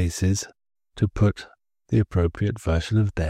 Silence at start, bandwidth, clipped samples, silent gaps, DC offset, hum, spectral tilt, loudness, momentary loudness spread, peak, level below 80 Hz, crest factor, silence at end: 0 s; 13.5 kHz; under 0.1%; none; under 0.1%; none; -6.5 dB/octave; -24 LUFS; 6 LU; -8 dBFS; -38 dBFS; 16 dB; 0 s